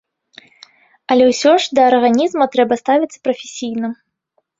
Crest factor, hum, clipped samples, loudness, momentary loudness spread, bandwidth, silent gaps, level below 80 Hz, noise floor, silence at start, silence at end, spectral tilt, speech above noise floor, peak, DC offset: 16 dB; none; under 0.1%; -15 LUFS; 12 LU; 7.8 kHz; none; -62 dBFS; -67 dBFS; 1.1 s; 0.65 s; -3.5 dB/octave; 53 dB; 0 dBFS; under 0.1%